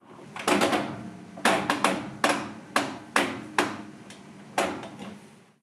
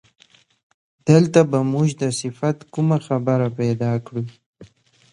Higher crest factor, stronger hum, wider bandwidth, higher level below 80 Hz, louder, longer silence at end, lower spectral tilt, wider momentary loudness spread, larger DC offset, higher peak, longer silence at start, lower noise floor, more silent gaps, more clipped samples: about the same, 24 dB vs 20 dB; neither; first, 15 kHz vs 11 kHz; second, -66 dBFS vs -60 dBFS; second, -27 LUFS vs -20 LUFS; second, 0.35 s vs 0.5 s; second, -3 dB/octave vs -7 dB/octave; first, 18 LU vs 12 LU; neither; second, -4 dBFS vs 0 dBFS; second, 0.1 s vs 1.05 s; about the same, -50 dBFS vs -50 dBFS; second, none vs 4.46-4.53 s; neither